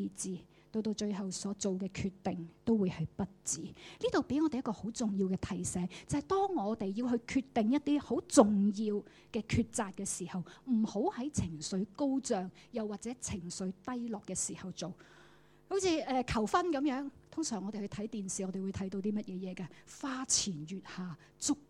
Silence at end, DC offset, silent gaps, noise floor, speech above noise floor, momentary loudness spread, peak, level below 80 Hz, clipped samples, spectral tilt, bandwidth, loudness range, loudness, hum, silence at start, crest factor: 0.05 s; under 0.1%; none; -62 dBFS; 27 dB; 11 LU; -10 dBFS; -60 dBFS; under 0.1%; -4.5 dB/octave; 14 kHz; 6 LU; -35 LUFS; none; 0 s; 26 dB